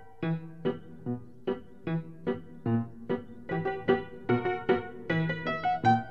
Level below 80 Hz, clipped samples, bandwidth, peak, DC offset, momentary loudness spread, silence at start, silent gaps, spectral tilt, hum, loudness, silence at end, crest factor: -60 dBFS; under 0.1%; 6.8 kHz; -12 dBFS; 0.3%; 8 LU; 0 s; none; -8.5 dB/octave; none; -32 LUFS; 0 s; 20 dB